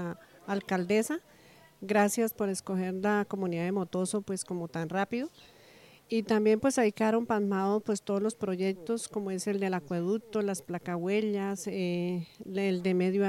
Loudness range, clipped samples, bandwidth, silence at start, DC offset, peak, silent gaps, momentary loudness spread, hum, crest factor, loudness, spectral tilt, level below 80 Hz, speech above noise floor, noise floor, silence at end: 3 LU; under 0.1%; 16 kHz; 0 s; under 0.1%; -14 dBFS; none; 9 LU; none; 18 dB; -31 LUFS; -5.5 dB/octave; -72 dBFS; 27 dB; -57 dBFS; 0 s